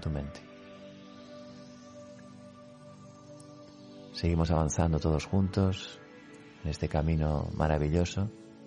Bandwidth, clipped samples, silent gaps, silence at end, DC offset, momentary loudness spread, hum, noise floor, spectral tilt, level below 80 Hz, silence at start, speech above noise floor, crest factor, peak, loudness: 10 kHz; under 0.1%; none; 0 s; under 0.1%; 23 LU; none; -51 dBFS; -6.5 dB/octave; -42 dBFS; 0 s; 22 dB; 18 dB; -14 dBFS; -30 LUFS